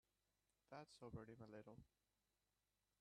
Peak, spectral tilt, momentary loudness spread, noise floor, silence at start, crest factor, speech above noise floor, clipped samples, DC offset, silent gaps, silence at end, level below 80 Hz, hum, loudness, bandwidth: -44 dBFS; -6.5 dB/octave; 7 LU; under -90 dBFS; 0.7 s; 20 dB; over 29 dB; under 0.1%; under 0.1%; none; 1.15 s; -82 dBFS; 50 Hz at -85 dBFS; -61 LUFS; 10 kHz